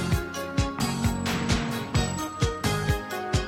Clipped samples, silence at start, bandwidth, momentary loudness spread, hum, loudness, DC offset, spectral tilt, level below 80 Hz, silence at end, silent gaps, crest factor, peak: under 0.1%; 0 s; 16.5 kHz; 3 LU; none; -27 LUFS; under 0.1%; -5 dB/octave; -36 dBFS; 0 s; none; 16 dB; -10 dBFS